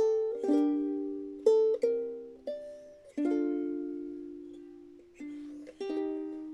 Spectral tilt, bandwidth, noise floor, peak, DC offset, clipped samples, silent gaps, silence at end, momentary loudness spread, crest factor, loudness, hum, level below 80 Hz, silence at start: -6 dB/octave; 9.8 kHz; -53 dBFS; -14 dBFS; under 0.1%; under 0.1%; none; 0 s; 20 LU; 20 dB; -32 LUFS; none; -72 dBFS; 0 s